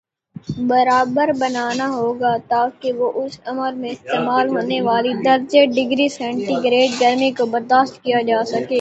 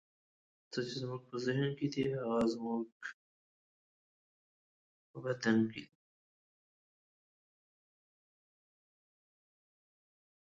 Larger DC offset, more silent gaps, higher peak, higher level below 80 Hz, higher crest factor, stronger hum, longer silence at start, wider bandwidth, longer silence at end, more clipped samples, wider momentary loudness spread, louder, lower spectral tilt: neither; second, none vs 2.92-3.00 s, 3.14-5.14 s; first, 0 dBFS vs -18 dBFS; first, -60 dBFS vs -76 dBFS; second, 16 dB vs 22 dB; neither; second, 0.45 s vs 0.7 s; about the same, 8.2 kHz vs 7.8 kHz; second, 0 s vs 4.6 s; neither; second, 9 LU vs 14 LU; first, -18 LUFS vs -37 LUFS; second, -4.5 dB/octave vs -6.5 dB/octave